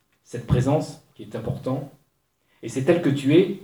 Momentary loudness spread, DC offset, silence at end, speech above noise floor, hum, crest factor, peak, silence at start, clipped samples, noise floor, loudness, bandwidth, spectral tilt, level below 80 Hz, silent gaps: 19 LU; under 0.1%; 0 s; 46 dB; none; 18 dB; -6 dBFS; 0.3 s; under 0.1%; -69 dBFS; -23 LUFS; 19.5 kHz; -7.5 dB/octave; -46 dBFS; none